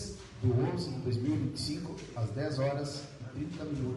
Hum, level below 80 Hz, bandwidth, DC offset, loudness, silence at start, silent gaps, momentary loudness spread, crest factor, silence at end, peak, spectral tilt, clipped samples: none; -58 dBFS; 11.5 kHz; under 0.1%; -35 LUFS; 0 s; none; 10 LU; 16 dB; 0 s; -18 dBFS; -6.5 dB/octave; under 0.1%